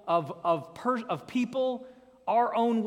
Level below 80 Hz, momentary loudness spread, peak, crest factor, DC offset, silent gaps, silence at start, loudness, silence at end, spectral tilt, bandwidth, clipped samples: -74 dBFS; 6 LU; -14 dBFS; 16 dB; under 0.1%; none; 0.05 s; -29 LUFS; 0 s; -6.5 dB/octave; 11.5 kHz; under 0.1%